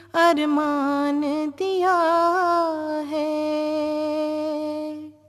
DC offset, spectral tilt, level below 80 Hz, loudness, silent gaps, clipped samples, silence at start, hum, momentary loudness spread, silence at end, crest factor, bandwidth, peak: under 0.1%; -4 dB/octave; -72 dBFS; -22 LUFS; none; under 0.1%; 0.15 s; none; 8 LU; 0.2 s; 16 dB; 13.5 kHz; -6 dBFS